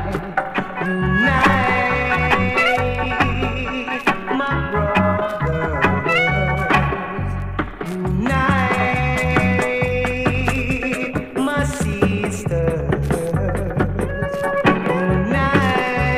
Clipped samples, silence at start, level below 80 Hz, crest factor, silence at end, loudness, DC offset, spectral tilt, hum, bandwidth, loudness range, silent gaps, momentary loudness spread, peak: under 0.1%; 0 s; -32 dBFS; 18 dB; 0 s; -19 LUFS; under 0.1%; -6 dB/octave; none; 15.5 kHz; 3 LU; none; 7 LU; 0 dBFS